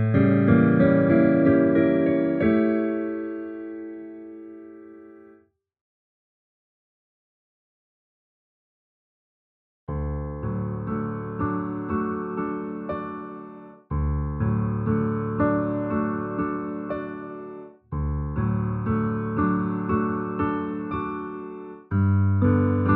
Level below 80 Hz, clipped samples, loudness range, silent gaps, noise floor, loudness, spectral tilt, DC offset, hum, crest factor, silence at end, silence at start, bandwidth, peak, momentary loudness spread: -42 dBFS; under 0.1%; 15 LU; 5.81-9.87 s; -58 dBFS; -24 LUFS; -12.5 dB/octave; under 0.1%; none; 18 dB; 0 s; 0 s; 4.3 kHz; -6 dBFS; 19 LU